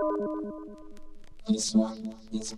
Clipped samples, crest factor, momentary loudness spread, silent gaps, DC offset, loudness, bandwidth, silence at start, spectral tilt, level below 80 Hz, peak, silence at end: under 0.1%; 18 dB; 18 LU; none; under 0.1%; -30 LUFS; 12 kHz; 0 s; -4.5 dB/octave; -52 dBFS; -14 dBFS; 0 s